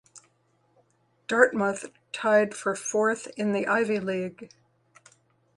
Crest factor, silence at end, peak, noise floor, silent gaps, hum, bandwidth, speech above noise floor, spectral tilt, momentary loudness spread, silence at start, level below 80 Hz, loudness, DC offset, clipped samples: 24 dB; 1.1 s; -4 dBFS; -68 dBFS; none; none; 11.5 kHz; 42 dB; -4.5 dB/octave; 14 LU; 0.15 s; -72 dBFS; -26 LUFS; under 0.1%; under 0.1%